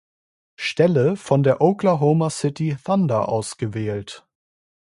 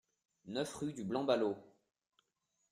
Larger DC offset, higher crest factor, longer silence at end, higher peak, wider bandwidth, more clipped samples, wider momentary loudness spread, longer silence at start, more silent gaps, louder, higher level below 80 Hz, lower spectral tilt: neither; about the same, 18 dB vs 22 dB; second, 0.8 s vs 1.05 s; first, -2 dBFS vs -20 dBFS; second, 11.5 kHz vs 13.5 kHz; neither; about the same, 10 LU vs 10 LU; first, 0.6 s vs 0.45 s; neither; first, -20 LUFS vs -38 LUFS; first, -58 dBFS vs -76 dBFS; first, -6.5 dB/octave vs -5 dB/octave